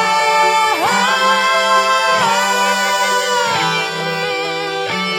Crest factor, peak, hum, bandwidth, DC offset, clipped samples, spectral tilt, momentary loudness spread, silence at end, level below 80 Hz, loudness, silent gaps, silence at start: 12 dB; -2 dBFS; none; 16.5 kHz; under 0.1%; under 0.1%; -1.5 dB/octave; 6 LU; 0 s; -64 dBFS; -14 LUFS; none; 0 s